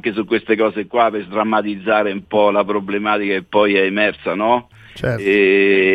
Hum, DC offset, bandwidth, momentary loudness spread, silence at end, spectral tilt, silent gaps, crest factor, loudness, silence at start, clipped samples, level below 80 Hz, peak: none; under 0.1%; 8.2 kHz; 7 LU; 0 s; -7 dB/octave; none; 16 dB; -17 LUFS; 0.05 s; under 0.1%; -52 dBFS; -2 dBFS